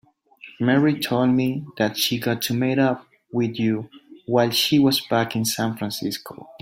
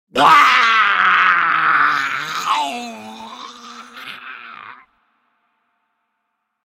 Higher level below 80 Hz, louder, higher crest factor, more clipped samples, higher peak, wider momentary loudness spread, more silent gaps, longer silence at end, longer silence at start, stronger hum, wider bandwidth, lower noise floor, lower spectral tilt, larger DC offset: about the same, -62 dBFS vs -62 dBFS; second, -22 LUFS vs -13 LUFS; about the same, 16 dB vs 18 dB; neither; second, -6 dBFS vs 0 dBFS; second, 11 LU vs 24 LU; neither; second, 0.05 s vs 1.9 s; first, 0.45 s vs 0.15 s; neither; about the same, 16.5 kHz vs 16.5 kHz; second, -47 dBFS vs -73 dBFS; first, -5 dB/octave vs -1.5 dB/octave; neither